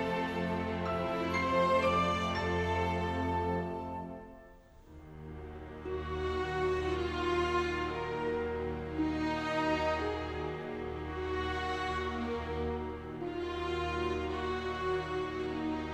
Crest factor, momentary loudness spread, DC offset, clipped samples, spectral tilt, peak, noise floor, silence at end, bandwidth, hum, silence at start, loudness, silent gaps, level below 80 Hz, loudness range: 16 dB; 10 LU; under 0.1%; under 0.1%; -6.5 dB/octave; -18 dBFS; -56 dBFS; 0 s; 12.5 kHz; none; 0 s; -34 LUFS; none; -48 dBFS; 6 LU